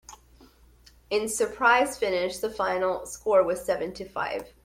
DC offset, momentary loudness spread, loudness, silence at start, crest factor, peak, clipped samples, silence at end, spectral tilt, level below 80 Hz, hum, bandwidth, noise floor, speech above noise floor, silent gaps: under 0.1%; 10 LU; -26 LUFS; 0.1 s; 20 dB; -8 dBFS; under 0.1%; 0.15 s; -3 dB/octave; -56 dBFS; none; 16 kHz; -56 dBFS; 30 dB; none